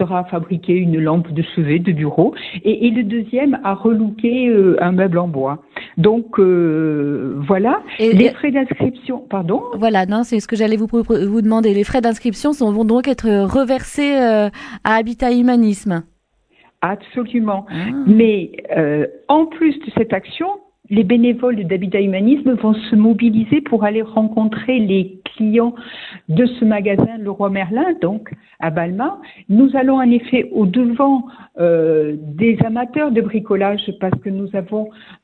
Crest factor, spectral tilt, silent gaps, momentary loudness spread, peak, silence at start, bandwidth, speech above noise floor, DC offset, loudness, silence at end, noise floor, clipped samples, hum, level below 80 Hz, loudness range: 16 dB; -7.5 dB/octave; none; 9 LU; 0 dBFS; 0 s; 10.5 kHz; 42 dB; under 0.1%; -16 LUFS; 0.1 s; -57 dBFS; under 0.1%; none; -46 dBFS; 3 LU